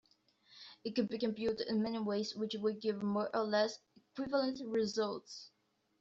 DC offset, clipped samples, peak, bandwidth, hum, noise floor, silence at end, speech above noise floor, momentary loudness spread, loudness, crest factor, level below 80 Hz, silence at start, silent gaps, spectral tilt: under 0.1%; under 0.1%; -20 dBFS; 7.8 kHz; none; -70 dBFS; 0.5 s; 34 dB; 16 LU; -37 LUFS; 18 dB; -74 dBFS; 0.5 s; none; -4 dB/octave